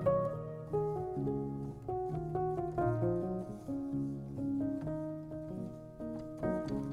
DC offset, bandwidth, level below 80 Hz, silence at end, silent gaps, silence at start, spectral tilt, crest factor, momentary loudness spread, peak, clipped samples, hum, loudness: under 0.1%; 11.5 kHz; -56 dBFS; 0 s; none; 0 s; -10 dB/octave; 16 dB; 9 LU; -20 dBFS; under 0.1%; none; -38 LUFS